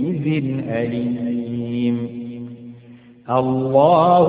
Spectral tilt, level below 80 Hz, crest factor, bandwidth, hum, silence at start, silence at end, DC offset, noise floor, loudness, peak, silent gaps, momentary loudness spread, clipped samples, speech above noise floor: -12.5 dB/octave; -56 dBFS; 16 dB; 4.8 kHz; none; 0 s; 0 s; under 0.1%; -44 dBFS; -19 LUFS; -2 dBFS; none; 20 LU; under 0.1%; 27 dB